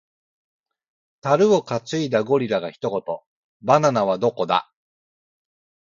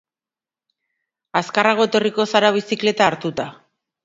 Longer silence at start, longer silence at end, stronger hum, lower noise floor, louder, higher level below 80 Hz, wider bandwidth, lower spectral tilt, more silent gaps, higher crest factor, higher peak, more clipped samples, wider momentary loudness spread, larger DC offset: about the same, 1.25 s vs 1.35 s; first, 1.25 s vs 0.5 s; neither; about the same, under -90 dBFS vs under -90 dBFS; second, -21 LUFS vs -18 LUFS; about the same, -66 dBFS vs -64 dBFS; about the same, 7.6 kHz vs 7.8 kHz; first, -6 dB/octave vs -4 dB/octave; first, 3.26-3.60 s vs none; about the same, 22 dB vs 20 dB; about the same, -2 dBFS vs 0 dBFS; neither; about the same, 12 LU vs 10 LU; neither